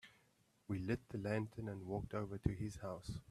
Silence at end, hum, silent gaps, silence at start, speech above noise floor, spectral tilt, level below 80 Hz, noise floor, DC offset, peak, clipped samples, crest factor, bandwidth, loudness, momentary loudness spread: 0.1 s; none; none; 0.05 s; 32 dB; -7.5 dB/octave; -58 dBFS; -76 dBFS; under 0.1%; -20 dBFS; under 0.1%; 24 dB; 13.5 kHz; -44 LUFS; 7 LU